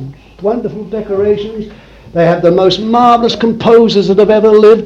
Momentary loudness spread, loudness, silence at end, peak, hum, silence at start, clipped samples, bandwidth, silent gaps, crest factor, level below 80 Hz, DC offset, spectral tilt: 14 LU; -10 LUFS; 0 s; 0 dBFS; none; 0 s; 0.7%; 7.6 kHz; none; 10 dB; -40 dBFS; under 0.1%; -6.5 dB/octave